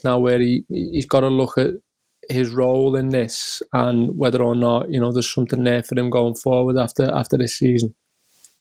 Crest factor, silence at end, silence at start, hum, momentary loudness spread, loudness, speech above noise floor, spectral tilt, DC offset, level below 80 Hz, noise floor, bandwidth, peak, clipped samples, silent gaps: 16 dB; 0.7 s; 0.05 s; none; 6 LU; -19 LUFS; 37 dB; -6 dB/octave; 0.1%; -52 dBFS; -56 dBFS; 16 kHz; -2 dBFS; under 0.1%; none